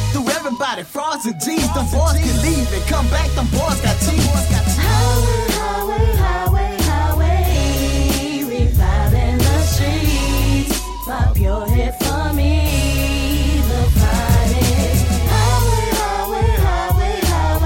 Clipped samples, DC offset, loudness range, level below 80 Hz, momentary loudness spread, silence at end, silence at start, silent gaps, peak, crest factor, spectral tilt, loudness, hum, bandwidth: under 0.1%; under 0.1%; 2 LU; -18 dBFS; 4 LU; 0 s; 0 s; none; -4 dBFS; 12 dB; -5 dB/octave; -17 LUFS; none; 17 kHz